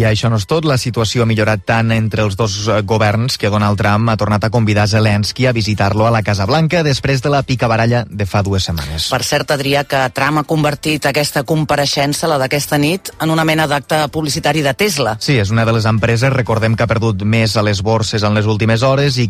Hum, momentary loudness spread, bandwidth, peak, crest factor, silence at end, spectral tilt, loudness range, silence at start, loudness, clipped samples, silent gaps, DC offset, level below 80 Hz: none; 3 LU; 15.5 kHz; -4 dBFS; 10 dB; 0 s; -5.5 dB/octave; 1 LU; 0 s; -14 LUFS; under 0.1%; none; under 0.1%; -38 dBFS